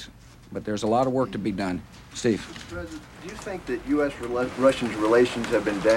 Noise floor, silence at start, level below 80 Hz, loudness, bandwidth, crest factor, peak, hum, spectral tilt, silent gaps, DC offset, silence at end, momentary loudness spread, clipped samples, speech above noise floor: -46 dBFS; 0 s; -50 dBFS; -25 LUFS; 16 kHz; 18 dB; -8 dBFS; none; -5.5 dB/octave; none; under 0.1%; 0 s; 16 LU; under 0.1%; 21 dB